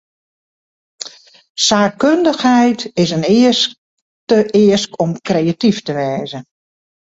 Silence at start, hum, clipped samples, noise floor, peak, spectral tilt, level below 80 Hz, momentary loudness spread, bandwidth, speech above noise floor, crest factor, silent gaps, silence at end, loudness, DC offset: 1 s; none; under 0.1%; -34 dBFS; 0 dBFS; -4.5 dB/octave; -56 dBFS; 18 LU; 8 kHz; 21 dB; 16 dB; 1.49-1.55 s, 3.78-4.27 s; 0.7 s; -14 LUFS; under 0.1%